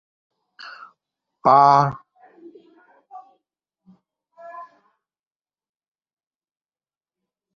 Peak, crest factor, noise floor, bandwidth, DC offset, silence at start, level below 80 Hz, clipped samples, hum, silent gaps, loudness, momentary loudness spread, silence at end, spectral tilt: -2 dBFS; 24 dB; under -90 dBFS; 6.8 kHz; under 0.1%; 0.65 s; -66 dBFS; under 0.1%; none; none; -16 LUFS; 28 LU; 2.9 s; -7 dB/octave